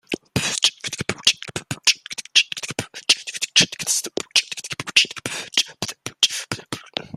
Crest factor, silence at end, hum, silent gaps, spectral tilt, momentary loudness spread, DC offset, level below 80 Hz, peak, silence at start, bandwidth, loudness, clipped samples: 24 dB; 0 s; none; none; -0.5 dB/octave; 12 LU; under 0.1%; -60 dBFS; 0 dBFS; 0.1 s; 15.5 kHz; -20 LUFS; under 0.1%